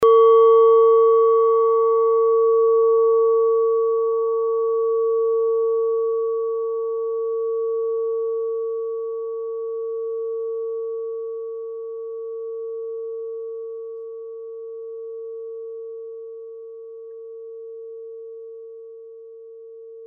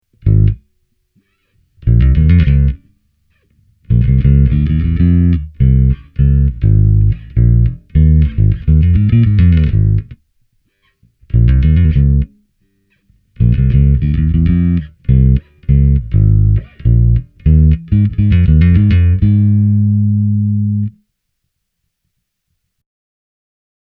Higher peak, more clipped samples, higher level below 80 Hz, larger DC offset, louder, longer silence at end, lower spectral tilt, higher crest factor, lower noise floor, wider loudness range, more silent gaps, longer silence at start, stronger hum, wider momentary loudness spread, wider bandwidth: second, -6 dBFS vs 0 dBFS; neither; second, -74 dBFS vs -16 dBFS; neither; second, -20 LUFS vs -12 LUFS; second, 0 s vs 2.9 s; second, 0.5 dB/octave vs -12 dB/octave; about the same, 14 dB vs 12 dB; second, -40 dBFS vs -70 dBFS; first, 19 LU vs 4 LU; neither; second, 0 s vs 0.25 s; neither; first, 22 LU vs 6 LU; second, 3.4 kHz vs 4 kHz